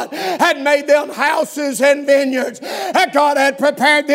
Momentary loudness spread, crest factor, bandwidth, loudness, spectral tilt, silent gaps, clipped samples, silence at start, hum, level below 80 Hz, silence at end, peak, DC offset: 7 LU; 14 dB; 16 kHz; -15 LUFS; -2.5 dB/octave; none; under 0.1%; 0 s; none; -76 dBFS; 0 s; 0 dBFS; under 0.1%